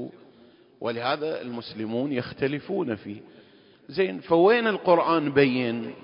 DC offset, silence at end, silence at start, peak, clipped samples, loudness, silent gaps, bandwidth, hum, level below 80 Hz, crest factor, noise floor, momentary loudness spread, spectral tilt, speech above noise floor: under 0.1%; 0.05 s; 0 s; -6 dBFS; under 0.1%; -25 LUFS; none; 5.4 kHz; none; -64 dBFS; 20 dB; -55 dBFS; 14 LU; -10.5 dB/octave; 30 dB